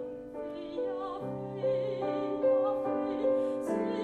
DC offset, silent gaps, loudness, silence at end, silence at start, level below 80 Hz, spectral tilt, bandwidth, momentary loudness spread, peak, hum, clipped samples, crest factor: under 0.1%; none; -32 LUFS; 0 s; 0 s; -66 dBFS; -7.5 dB/octave; 9.8 kHz; 11 LU; -18 dBFS; none; under 0.1%; 14 dB